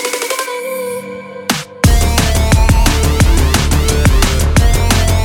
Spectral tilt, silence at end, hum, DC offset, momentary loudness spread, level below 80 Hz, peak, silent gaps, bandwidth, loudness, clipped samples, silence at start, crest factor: -4.5 dB/octave; 0 s; none; under 0.1%; 9 LU; -14 dBFS; 0 dBFS; none; 17.5 kHz; -13 LUFS; under 0.1%; 0 s; 12 dB